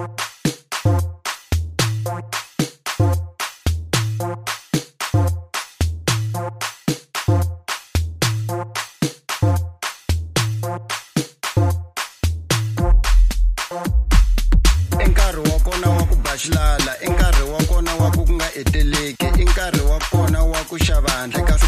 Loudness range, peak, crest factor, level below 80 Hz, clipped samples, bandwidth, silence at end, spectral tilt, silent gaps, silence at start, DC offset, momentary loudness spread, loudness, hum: 4 LU; -2 dBFS; 16 dB; -20 dBFS; under 0.1%; 15.5 kHz; 0 s; -4.5 dB/octave; none; 0 s; under 0.1%; 8 LU; -20 LUFS; none